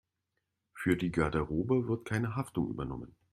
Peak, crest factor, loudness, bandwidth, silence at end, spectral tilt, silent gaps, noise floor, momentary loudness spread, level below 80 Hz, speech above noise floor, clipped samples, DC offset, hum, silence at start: -14 dBFS; 20 dB; -33 LUFS; 14 kHz; 0.25 s; -7.5 dB/octave; none; -84 dBFS; 8 LU; -52 dBFS; 52 dB; under 0.1%; under 0.1%; none; 0.75 s